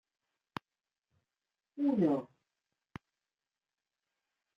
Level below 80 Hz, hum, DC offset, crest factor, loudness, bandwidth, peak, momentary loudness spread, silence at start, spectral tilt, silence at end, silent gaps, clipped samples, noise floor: -78 dBFS; none; under 0.1%; 20 dB; -32 LUFS; 6.4 kHz; -18 dBFS; 23 LU; 1.75 s; -9 dB/octave; 2.35 s; none; under 0.1%; under -90 dBFS